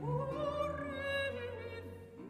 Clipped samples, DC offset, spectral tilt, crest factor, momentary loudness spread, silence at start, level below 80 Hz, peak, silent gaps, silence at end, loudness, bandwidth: under 0.1%; under 0.1%; -6.5 dB/octave; 14 dB; 10 LU; 0 s; -60 dBFS; -26 dBFS; none; 0 s; -39 LUFS; 15 kHz